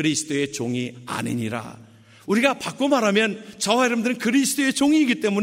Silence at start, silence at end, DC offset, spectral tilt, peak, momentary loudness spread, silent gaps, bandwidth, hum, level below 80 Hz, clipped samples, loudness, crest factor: 0 s; 0 s; under 0.1%; -4 dB/octave; -4 dBFS; 11 LU; none; 16 kHz; none; -64 dBFS; under 0.1%; -22 LUFS; 18 dB